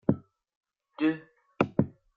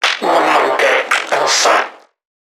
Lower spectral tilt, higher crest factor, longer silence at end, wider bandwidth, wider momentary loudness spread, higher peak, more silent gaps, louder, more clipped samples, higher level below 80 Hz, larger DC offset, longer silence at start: first, -9.5 dB/octave vs 0 dB/octave; first, 24 dB vs 14 dB; second, 0.3 s vs 0.55 s; second, 6.4 kHz vs 19 kHz; first, 8 LU vs 4 LU; second, -8 dBFS vs 0 dBFS; first, 0.56-0.61 s vs none; second, -30 LUFS vs -13 LUFS; neither; first, -64 dBFS vs -74 dBFS; neither; about the same, 0.1 s vs 0 s